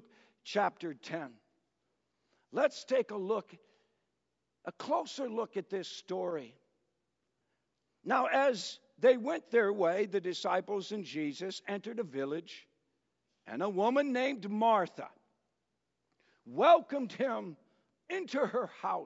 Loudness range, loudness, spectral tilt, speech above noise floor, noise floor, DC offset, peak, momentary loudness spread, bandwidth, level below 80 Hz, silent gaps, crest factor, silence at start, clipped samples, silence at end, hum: 8 LU; -33 LUFS; -3 dB/octave; 52 dB; -84 dBFS; under 0.1%; -14 dBFS; 15 LU; 7.6 kHz; under -90 dBFS; none; 22 dB; 0.45 s; under 0.1%; 0 s; none